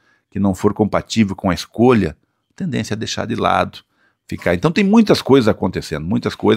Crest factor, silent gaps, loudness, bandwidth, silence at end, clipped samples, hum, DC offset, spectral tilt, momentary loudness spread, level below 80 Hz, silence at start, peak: 16 dB; none; -17 LUFS; 15.5 kHz; 0 s; under 0.1%; none; under 0.1%; -6 dB/octave; 11 LU; -44 dBFS; 0.35 s; 0 dBFS